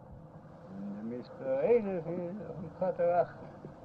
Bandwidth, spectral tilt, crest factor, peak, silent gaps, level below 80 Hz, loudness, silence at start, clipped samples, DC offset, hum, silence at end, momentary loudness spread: 5.2 kHz; -9.5 dB/octave; 18 dB; -16 dBFS; none; -66 dBFS; -33 LUFS; 0 s; under 0.1%; under 0.1%; none; 0 s; 22 LU